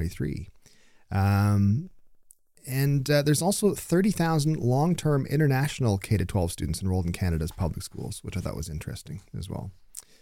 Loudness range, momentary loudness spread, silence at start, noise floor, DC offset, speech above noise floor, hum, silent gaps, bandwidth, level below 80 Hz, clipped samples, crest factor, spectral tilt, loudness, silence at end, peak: 7 LU; 15 LU; 0 s; -56 dBFS; under 0.1%; 31 dB; none; none; 16.5 kHz; -44 dBFS; under 0.1%; 16 dB; -6 dB/octave; -26 LUFS; 0.2 s; -10 dBFS